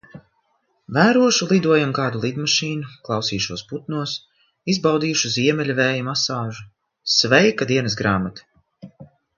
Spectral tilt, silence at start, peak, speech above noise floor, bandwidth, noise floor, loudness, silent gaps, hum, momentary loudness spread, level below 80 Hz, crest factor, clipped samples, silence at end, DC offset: -4 dB/octave; 0.15 s; 0 dBFS; 47 dB; 7.4 kHz; -67 dBFS; -19 LUFS; none; none; 14 LU; -54 dBFS; 20 dB; under 0.1%; 0.35 s; under 0.1%